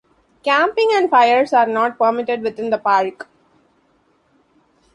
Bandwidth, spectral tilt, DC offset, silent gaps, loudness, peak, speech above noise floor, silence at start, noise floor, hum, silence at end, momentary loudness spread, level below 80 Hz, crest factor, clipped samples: 11 kHz; -4 dB/octave; under 0.1%; none; -16 LUFS; -2 dBFS; 44 dB; 0.45 s; -60 dBFS; none; 1.7 s; 9 LU; -66 dBFS; 16 dB; under 0.1%